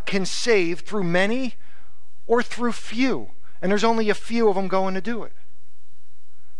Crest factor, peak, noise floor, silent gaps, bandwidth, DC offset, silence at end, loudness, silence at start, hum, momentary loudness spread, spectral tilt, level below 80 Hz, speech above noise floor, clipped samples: 16 dB; -8 dBFS; -64 dBFS; none; 12 kHz; 8%; 1.3 s; -23 LUFS; 0.05 s; none; 10 LU; -5 dB/octave; -58 dBFS; 41 dB; under 0.1%